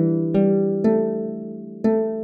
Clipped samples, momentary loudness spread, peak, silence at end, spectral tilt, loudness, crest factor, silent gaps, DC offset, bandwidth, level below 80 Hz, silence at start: under 0.1%; 11 LU; -6 dBFS; 0 s; -11 dB/octave; -21 LUFS; 14 dB; none; under 0.1%; 5 kHz; -56 dBFS; 0 s